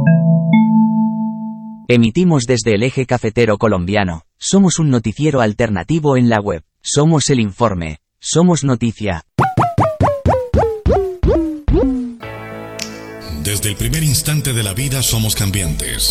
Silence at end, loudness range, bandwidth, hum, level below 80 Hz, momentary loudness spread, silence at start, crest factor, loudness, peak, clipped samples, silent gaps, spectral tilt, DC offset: 0 s; 4 LU; 15.5 kHz; none; -30 dBFS; 12 LU; 0 s; 14 dB; -15 LUFS; 0 dBFS; under 0.1%; none; -5.5 dB/octave; under 0.1%